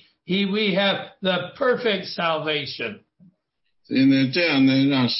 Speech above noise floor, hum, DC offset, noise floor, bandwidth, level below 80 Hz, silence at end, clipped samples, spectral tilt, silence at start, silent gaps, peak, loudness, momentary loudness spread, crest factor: 53 dB; none; under 0.1%; -74 dBFS; 5.8 kHz; -66 dBFS; 0 s; under 0.1%; -8.5 dB/octave; 0.3 s; none; -8 dBFS; -21 LUFS; 8 LU; 14 dB